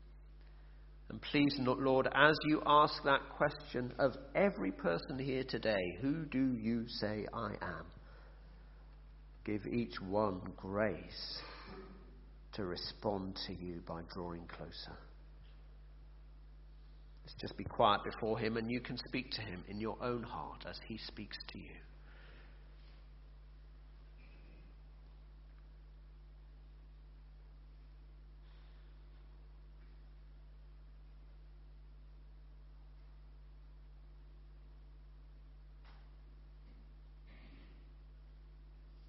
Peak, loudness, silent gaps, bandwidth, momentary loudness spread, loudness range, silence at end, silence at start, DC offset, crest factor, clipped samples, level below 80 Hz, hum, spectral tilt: -10 dBFS; -37 LUFS; none; 5.8 kHz; 27 LU; 27 LU; 0 s; 0 s; under 0.1%; 30 dB; under 0.1%; -56 dBFS; 50 Hz at -55 dBFS; -3.5 dB/octave